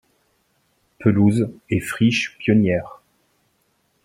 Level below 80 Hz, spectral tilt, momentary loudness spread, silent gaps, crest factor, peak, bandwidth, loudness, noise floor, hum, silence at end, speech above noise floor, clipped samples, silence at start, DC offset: -54 dBFS; -6.5 dB/octave; 8 LU; none; 18 dB; -2 dBFS; 16 kHz; -20 LUFS; -66 dBFS; none; 1.1 s; 48 dB; under 0.1%; 1 s; under 0.1%